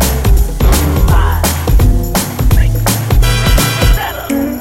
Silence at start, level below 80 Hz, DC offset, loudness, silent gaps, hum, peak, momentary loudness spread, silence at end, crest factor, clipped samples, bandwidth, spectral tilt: 0 s; -12 dBFS; under 0.1%; -12 LUFS; none; none; 0 dBFS; 4 LU; 0 s; 10 dB; under 0.1%; 17 kHz; -5 dB/octave